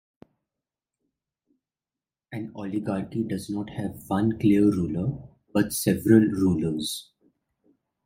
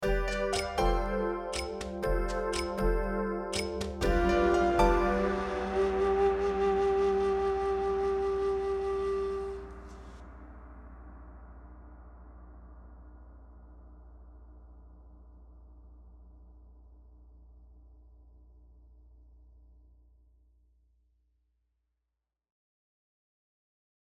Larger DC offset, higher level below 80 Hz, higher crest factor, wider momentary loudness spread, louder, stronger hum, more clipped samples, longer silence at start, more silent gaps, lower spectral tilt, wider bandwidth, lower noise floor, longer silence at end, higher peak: neither; second, -58 dBFS vs -42 dBFS; about the same, 20 dB vs 22 dB; second, 15 LU vs 26 LU; first, -25 LUFS vs -30 LUFS; neither; neither; first, 2.3 s vs 0 s; neither; about the same, -6 dB/octave vs -5.5 dB/octave; about the same, 16 kHz vs 15 kHz; about the same, under -90 dBFS vs -87 dBFS; second, 1.05 s vs 6.4 s; first, -6 dBFS vs -12 dBFS